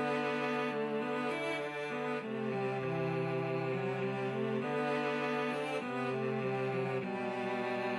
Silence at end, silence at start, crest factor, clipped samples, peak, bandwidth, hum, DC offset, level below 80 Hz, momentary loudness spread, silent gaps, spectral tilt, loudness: 0 s; 0 s; 12 dB; under 0.1%; -22 dBFS; 12.5 kHz; none; under 0.1%; -82 dBFS; 3 LU; none; -6.5 dB/octave; -35 LUFS